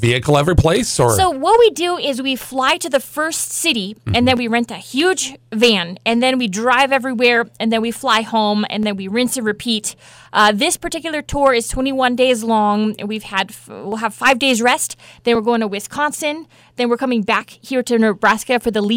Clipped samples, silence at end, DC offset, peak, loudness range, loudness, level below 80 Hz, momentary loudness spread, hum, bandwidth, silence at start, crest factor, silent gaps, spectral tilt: under 0.1%; 0 s; under 0.1%; -2 dBFS; 2 LU; -16 LUFS; -40 dBFS; 8 LU; none; 17 kHz; 0 s; 14 dB; none; -4 dB/octave